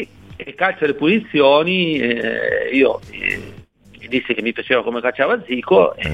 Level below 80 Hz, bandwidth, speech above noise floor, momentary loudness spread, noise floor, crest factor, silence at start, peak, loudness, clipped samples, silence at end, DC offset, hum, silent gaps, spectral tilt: -48 dBFS; 10.5 kHz; 26 dB; 9 LU; -43 dBFS; 16 dB; 0 s; -2 dBFS; -17 LUFS; under 0.1%; 0 s; 0.2%; none; none; -6.5 dB/octave